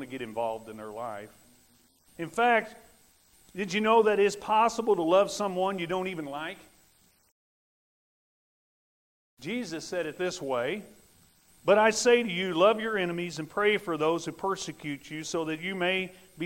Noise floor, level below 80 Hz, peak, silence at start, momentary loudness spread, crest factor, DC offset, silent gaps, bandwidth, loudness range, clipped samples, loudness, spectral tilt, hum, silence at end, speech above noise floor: -64 dBFS; -66 dBFS; -8 dBFS; 0 s; 16 LU; 20 dB; under 0.1%; 7.32-9.37 s; 16 kHz; 13 LU; under 0.1%; -28 LUFS; -4 dB/octave; none; 0 s; 36 dB